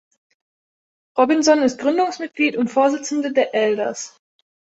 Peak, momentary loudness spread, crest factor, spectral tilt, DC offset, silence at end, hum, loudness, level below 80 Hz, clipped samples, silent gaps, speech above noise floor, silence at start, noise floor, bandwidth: -2 dBFS; 10 LU; 18 dB; -3.5 dB/octave; under 0.1%; 0.7 s; none; -19 LUFS; -66 dBFS; under 0.1%; none; over 72 dB; 1.15 s; under -90 dBFS; 8.2 kHz